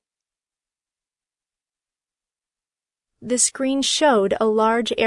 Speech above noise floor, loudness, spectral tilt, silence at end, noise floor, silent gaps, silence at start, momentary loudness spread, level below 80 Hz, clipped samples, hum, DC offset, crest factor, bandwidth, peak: over 71 dB; -19 LUFS; -2 dB/octave; 0 s; under -90 dBFS; none; 3.2 s; 3 LU; -64 dBFS; under 0.1%; none; under 0.1%; 18 dB; 11 kHz; -6 dBFS